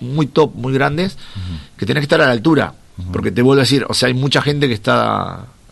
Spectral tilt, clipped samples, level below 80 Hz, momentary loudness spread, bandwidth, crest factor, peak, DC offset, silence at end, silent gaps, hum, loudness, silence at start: -5.5 dB/octave; under 0.1%; -40 dBFS; 15 LU; 12.5 kHz; 14 dB; -2 dBFS; under 0.1%; 0.25 s; none; none; -15 LUFS; 0 s